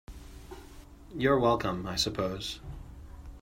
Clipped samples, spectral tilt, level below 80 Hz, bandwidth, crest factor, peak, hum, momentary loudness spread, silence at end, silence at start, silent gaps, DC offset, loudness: under 0.1%; -4.5 dB/octave; -48 dBFS; 16 kHz; 20 dB; -12 dBFS; none; 23 LU; 0 s; 0.1 s; none; under 0.1%; -29 LUFS